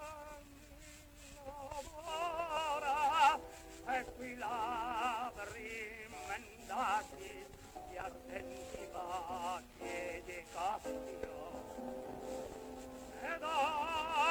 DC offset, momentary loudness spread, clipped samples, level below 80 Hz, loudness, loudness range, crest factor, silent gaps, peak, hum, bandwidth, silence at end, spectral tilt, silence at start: under 0.1%; 16 LU; under 0.1%; -62 dBFS; -40 LUFS; 8 LU; 22 dB; none; -18 dBFS; none; over 20 kHz; 0 s; -3 dB/octave; 0 s